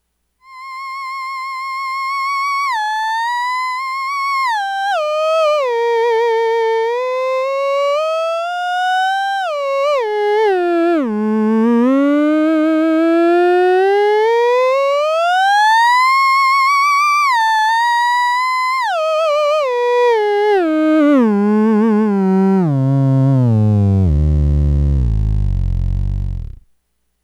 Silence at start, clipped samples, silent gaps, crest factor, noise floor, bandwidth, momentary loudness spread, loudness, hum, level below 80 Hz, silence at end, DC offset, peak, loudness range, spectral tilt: 0.5 s; under 0.1%; none; 10 dB; -64 dBFS; 16.5 kHz; 8 LU; -14 LUFS; none; -26 dBFS; 0.75 s; under 0.1%; -6 dBFS; 5 LU; -6.5 dB/octave